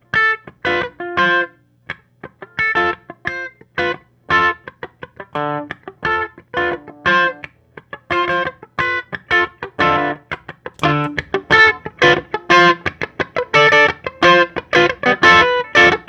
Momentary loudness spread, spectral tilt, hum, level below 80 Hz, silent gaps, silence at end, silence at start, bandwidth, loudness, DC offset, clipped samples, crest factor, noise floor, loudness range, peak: 19 LU; -4.5 dB/octave; none; -48 dBFS; none; 0.05 s; 0.15 s; 10.5 kHz; -15 LUFS; under 0.1%; under 0.1%; 16 dB; -40 dBFS; 8 LU; 0 dBFS